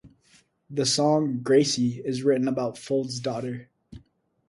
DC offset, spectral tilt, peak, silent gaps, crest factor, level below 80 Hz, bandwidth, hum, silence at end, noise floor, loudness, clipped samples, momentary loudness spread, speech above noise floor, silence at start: under 0.1%; -4.5 dB/octave; -8 dBFS; none; 18 dB; -62 dBFS; 11.5 kHz; none; 0.5 s; -63 dBFS; -25 LUFS; under 0.1%; 11 LU; 38 dB; 0.05 s